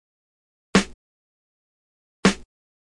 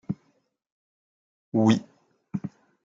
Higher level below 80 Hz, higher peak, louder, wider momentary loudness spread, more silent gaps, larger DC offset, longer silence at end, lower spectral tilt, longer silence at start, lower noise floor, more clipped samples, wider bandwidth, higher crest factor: first, -48 dBFS vs -70 dBFS; about the same, -8 dBFS vs -8 dBFS; first, -22 LUFS vs -27 LUFS; about the same, 14 LU vs 15 LU; first, 0.94-2.23 s vs 0.72-1.52 s; neither; first, 0.65 s vs 0.35 s; second, -4.5 dB/octave vs -7 dB/octave; first, 0.75 s vs 0.1 s; first, under -90 dBFS vs -60 dBFS; neither; first, 11.5 kHz vs 7.6 kHz; about the same, 20 dB vs 22 dB